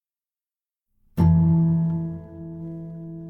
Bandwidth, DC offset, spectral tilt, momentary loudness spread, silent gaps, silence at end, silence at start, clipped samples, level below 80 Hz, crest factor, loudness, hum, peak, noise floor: 2.2 kHz; under 0.1%; -11.5 dB/octave; 18 LU; none; 0 s; 1.15 s; under 0.1%; -42 dBFS; 16 dB; -21 LUFS; none; -6 dBFS; under -90 dBFS